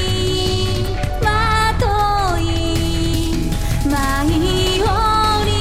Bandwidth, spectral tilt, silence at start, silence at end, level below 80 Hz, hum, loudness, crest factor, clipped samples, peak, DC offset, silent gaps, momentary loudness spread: 16 kHz; -5 dB/octave; 0 s; 0 s; -22 dBFS; none; -17 LUFS; 12 dB; under 0.1%; -4 dBFS; under 0.1%; none; 5 LU